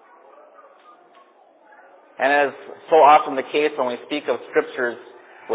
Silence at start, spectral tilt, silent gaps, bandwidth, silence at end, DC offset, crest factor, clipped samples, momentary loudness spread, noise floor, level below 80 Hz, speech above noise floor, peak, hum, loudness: 2.2 s; -7.5 dB/octave; none; 4 kHz; 0 s; under 0.1%; 20 dB; under 0.1%; 14 LU; -53 dBFS; under -90 dBFS; 34 dB; -2 dBFS; none; -19 LUFS